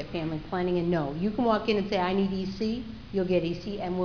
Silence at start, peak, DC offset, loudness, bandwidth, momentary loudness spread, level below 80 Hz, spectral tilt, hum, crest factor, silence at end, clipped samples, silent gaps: 0 s; -12 dBFS; 0.3%; -29 LUFS; 5.4 kHz; 7 LU; -50 dBFS; -7.5 dB/octave; none; 16 dB; 0 s; under 0.1%; none